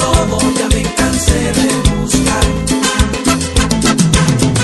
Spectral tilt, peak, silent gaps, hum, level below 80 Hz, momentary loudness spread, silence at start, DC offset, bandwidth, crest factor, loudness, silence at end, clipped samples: -4 dB/octave; 0 dBFS; none; none; -20 dBFS; 3 LU; 0 s; 0.4%; 12.5 kHz; 12 dB; -13 LUFS; 0 s; under 0.1%